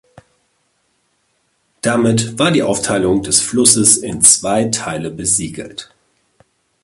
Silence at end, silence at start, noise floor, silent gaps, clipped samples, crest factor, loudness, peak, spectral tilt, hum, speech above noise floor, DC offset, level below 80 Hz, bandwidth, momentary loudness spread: 1 s; 1.85 s; -64 dBFS; none; under 0.1%; 16 dB; -13 LUFS; 0 dBFS; -3 dB/octave; none; 49 dB; under 0.1%; -46 dBFS; 16 kHz; 14 LU